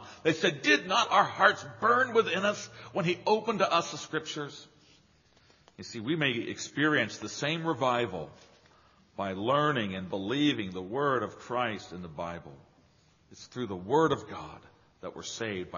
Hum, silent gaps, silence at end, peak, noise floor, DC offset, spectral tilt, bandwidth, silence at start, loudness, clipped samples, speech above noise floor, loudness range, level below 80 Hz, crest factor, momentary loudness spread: none; none; 0 s; -8 dBFS; -64 dBFS; under 0.1%; -2.5 dB/octave; 7.2 kHz; 0 s; -29 LUFS; under 0.1%; 34 dB; 8 LU; -68 dBFS; 24 dB; 17 LU